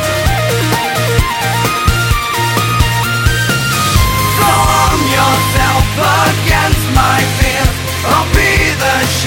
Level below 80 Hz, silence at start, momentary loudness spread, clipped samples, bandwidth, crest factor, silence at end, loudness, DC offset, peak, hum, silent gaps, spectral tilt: -20 dBFS; 0 s; 3 LU; under 0.1%; 17 kHz; 12 dB; 0 s; -11 LUFS; under 0.1%; 0 dBFS; none; none; -4 dB/octave